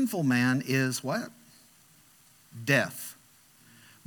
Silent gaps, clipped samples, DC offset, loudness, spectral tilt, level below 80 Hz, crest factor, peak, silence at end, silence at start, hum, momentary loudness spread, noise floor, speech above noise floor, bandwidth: none; under 0.1%; under 0.1%; -28 LUFS; -5 dB/octave; -78 dBFS; 20 dB; -10 dBFS; 0.95 s; 0 s; none; 17 LU; -60 dBFS; 32 dB; 19 kHz